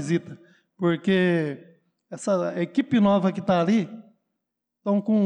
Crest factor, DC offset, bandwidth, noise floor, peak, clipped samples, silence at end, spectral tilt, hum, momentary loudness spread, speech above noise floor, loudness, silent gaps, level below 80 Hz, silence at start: 12 dB; under 0.1%; 9.8 kHz; -82 dBFS; -12 dBFS; under 0.1%; 0 s; -7 dB/octave; none; 13 LU; 60 dB; -24 LUFS; none; -68 dBFS; 0 s